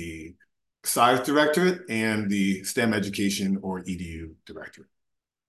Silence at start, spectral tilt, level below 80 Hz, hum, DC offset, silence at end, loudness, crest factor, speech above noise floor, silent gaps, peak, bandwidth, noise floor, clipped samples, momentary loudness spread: 0 s; -4.5 dB/octave; -54 dBFS; none; under 0.1%; 0.65 s; -25 LUFS; 20 dB; 58 dB; none; -6 dBFS; 13 kHz; -83 dBFS; under 0.1%; 21 LU